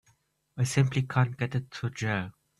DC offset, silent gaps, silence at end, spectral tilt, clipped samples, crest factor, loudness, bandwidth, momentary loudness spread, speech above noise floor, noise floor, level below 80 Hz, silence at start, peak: under 0.1%; none; 0.3 s; -6 dB/octave; under 0.1%; 22 dB; -29 LUFS; 12 kHz; 7 LU; 41 dB; -69 dBFS; -60 dBFS; 0.55 s; -8 dBFS